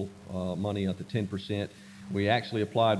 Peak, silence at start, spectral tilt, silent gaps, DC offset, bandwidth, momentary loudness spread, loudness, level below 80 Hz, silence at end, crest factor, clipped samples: -10 dBFS; 0 s; -7 dB/octave; none; under 0.1%; 11 kHz; 9 LU; -31 LUFS; -66 dBFS; 0 s; 20 dB; under 0.1%